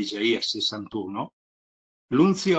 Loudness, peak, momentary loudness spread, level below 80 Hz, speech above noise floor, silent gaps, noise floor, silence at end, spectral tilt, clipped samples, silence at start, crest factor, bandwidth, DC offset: -25 LUFS; -8 dBFS; 12 LU; -66 dBFS; over 66 dB; 1.33-2.08 s; under -90 dBFS; 0 s; -5 dB/octave; under 0.1%; 0 s; 18 dB; 8.6 kHz; under 0.1%